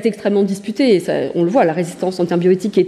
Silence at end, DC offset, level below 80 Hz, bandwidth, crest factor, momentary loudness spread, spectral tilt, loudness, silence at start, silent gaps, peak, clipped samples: 0 s; under 0.1%; -62 dBFS; 13 kHz; 12 dB; 5 LU; -6.5 dB/octave; -16 LUFS; 0 s; none; -2 dBFS; under 0.1%